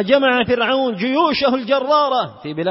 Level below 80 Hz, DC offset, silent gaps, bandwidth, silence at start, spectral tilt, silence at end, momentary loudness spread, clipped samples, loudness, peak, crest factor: -54 dBFS; under 0.1%; none; 5.8 kHz; 0 s; -8 dB/octave; 0 s; 6 LU; under 0.1%; -17 LUFS; 0 dBFS; 16 dB